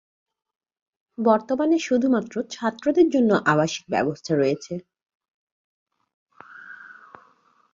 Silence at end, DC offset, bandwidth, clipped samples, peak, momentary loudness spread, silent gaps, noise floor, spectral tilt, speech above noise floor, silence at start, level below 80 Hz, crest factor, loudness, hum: 0.8 s; under 0.1%; 7.6 kHz; under 0.1%; -4 dBFS; 21 LU; 5.02-5.06 s, 5.15-5.20 s, 5.34-5.86 s, 6.14-6.26 s; -60 dBFS; -5.5 dB/octave; 39 dB; 1.2 s; -66 dBFS; 20 dB; -22 LUFS; none